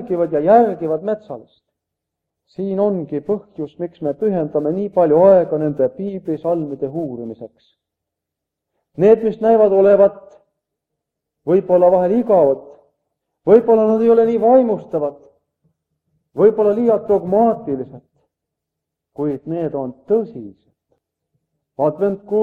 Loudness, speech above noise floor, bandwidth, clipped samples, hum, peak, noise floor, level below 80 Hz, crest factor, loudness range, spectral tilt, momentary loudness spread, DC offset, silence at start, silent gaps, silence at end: -16 LUFS; 66 dB; 4.4 kHz; under 0.1%; none; 0 dBFS; -82 dBFS; -60 dBFS; 18 dB; 9 LU; -10 dB/octave; 15 LU; under 0.1%; 0 s; none; 0 s